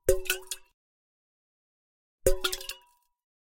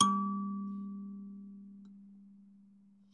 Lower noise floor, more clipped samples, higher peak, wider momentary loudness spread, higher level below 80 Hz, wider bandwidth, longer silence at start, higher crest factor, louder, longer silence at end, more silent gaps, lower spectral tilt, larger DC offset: about the same, -61 dBFS vs -62 dBFS; neither; first, -6 dBFS vs -10 dBFS; second, 13 LU vs 23 LU; first, -40 dBFS vs -86 dBFS; first, 17 kHz vs 10 kHz; about the same, 0.05 s vs 0 s; about the same, 26 dB vs 28 dB; first, -31 LUFS vs -38 LUFS; first, 0.75 s vs 0.55 s; first, 0.74-2.18 s vs none; second, -2.5 dB/octave vs -4.5 dB/octave; neither